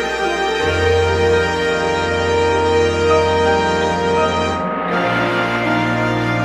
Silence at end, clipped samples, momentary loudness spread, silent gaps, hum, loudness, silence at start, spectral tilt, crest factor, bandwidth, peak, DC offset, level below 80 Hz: 0 s; under 0.1%; 3 LU; none; none; -16 LUFS; 0 s; -5 dB/octave; 14 dB; 12 kHz; -2 dBFS; under 0.1%; -36 dBFS